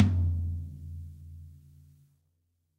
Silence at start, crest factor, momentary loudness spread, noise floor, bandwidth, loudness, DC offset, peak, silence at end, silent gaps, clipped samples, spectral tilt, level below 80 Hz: 0 s; 24 dB; 21 LU; -76 dBFS; 4.4 kHz; -33 LUFS; under 0.1%; -8 dBFS; 1.25 s; none; under 0.1%; -9 dB/octave; -44 dBFS